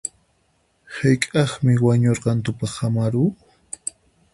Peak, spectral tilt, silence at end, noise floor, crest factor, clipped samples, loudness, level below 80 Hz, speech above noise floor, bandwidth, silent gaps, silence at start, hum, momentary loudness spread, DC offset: -2 dBFS; -6 dB/octave; 1 s; -64 dBFS; 20 dB; under 0.1%; -21 LUFS; -52 dBFS; 46 dB; 11.5 kHz; none; 0.05 s; none; 15 LU; under 0.1%